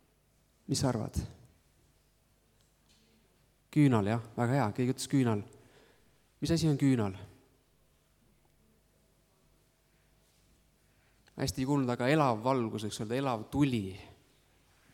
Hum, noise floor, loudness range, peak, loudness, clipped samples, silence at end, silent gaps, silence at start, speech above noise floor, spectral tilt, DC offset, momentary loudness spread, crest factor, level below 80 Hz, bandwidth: 50 Hz at -60 dBFS; -69 dBFS; 8 LU; -14 dBFS; -31 LUFS; under 0.1%; 0.8 s; none; 0.7 s; 39 dB; -6 dB/octave; under 0.1%; 13 LU; 22 dB; -58 dBFS; 16.5 kHz